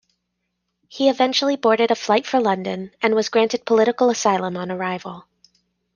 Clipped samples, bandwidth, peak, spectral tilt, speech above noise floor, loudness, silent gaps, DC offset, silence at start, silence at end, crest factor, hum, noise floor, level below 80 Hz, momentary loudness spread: under 0.1%; 10 kHz; -2 dBFS; -4 dB/octave; 57 dB; -19 LUFS; none; under 0.1%; 0.9 s; 0.75 s; 18 dB; 60 Hz at -50 dBFS; -76 dBFS; -68 dBFS; 9 LU